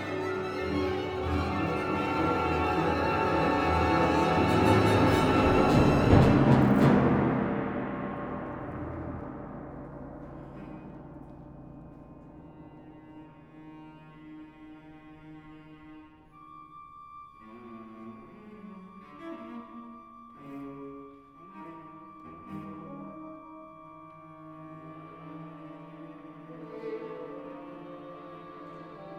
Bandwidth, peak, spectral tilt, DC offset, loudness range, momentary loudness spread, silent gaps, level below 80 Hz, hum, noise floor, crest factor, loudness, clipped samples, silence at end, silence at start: 18 kHz; -6 dBFS; -7.5 dB/octave; under 0.1%; 26 LU; 27 LU; none; -46 dBFS; none; -53 dBFS; 24 dB; -26 LUFS; under 0.1%; 0 s; 0 s